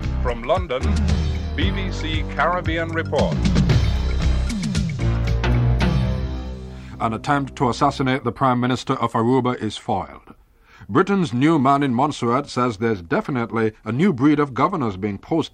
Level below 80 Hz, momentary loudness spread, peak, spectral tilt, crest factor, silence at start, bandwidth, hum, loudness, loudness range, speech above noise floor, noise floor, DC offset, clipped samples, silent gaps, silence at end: -28 dBFS; 7 LU; -4 dBFS; -7 dB/octave; 16 dB; 0 s; 11 kHz; none; -21 LUFS; 2 LU; 30 dB; -50 dBFS; under 0.1%; under 0.1%; none; 0.05 s